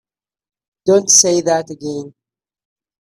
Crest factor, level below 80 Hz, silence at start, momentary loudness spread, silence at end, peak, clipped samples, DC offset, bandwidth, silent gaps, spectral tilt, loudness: 18 dB; -62 dBFS; 0.85 s; 17 LU; 0.95 s; 0 dBFS; under 0.1%; under 0.1%; 16 kHz; none; -2.5 dB/octave; -12 LUFS